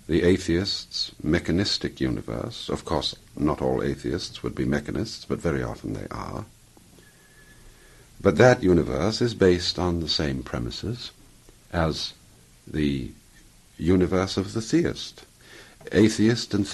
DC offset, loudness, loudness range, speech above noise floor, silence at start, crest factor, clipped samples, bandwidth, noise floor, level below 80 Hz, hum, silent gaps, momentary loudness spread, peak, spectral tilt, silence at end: under 0.1%; -25 LUFS; 8 LU; 29 dB; 0.1 s; 22 dB; under 0.1%; 12.5 kHz; -53 dBFS; -44 dBFS; none; none; 13 LU; -4 dBFS; -5.5 dB/octave; 0 s